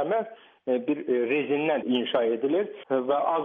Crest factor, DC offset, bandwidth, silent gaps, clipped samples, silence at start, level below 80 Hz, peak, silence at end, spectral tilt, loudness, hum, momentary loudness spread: 14 dB; under 0.1%; 3.8 kHz; none; under 0.1%; 0 s; -80 dBFS; -12 dBFS; 0 s; -8 dB/octave; -26 LUFS; none; 4 LU